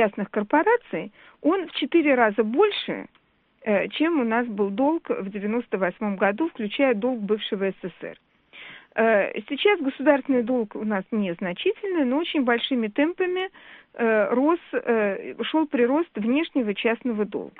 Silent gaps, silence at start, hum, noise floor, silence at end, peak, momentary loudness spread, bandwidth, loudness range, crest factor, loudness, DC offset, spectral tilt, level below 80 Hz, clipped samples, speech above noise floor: none; 0 s; none; -46 dBFS; 0.1 s; -4 dBFS; 9 LU; 4.6 kHz; 2 LU; 20 dB; -24 LUFS; under 0.1%; -3.5 dB/octave; -68 dBFS; under 0.1%; 22 dB